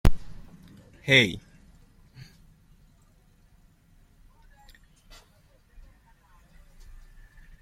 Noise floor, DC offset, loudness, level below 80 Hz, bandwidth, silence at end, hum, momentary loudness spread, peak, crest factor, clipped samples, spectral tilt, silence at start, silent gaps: -60 dBFS; under 0.1%; -22 LUFS; -38 dBFS; 16 kHz; 6.25 s; none; 32 LU; -4 dBFS; 26 dB; under 0.1%; -4.5 dB/octave; 0.05 s; none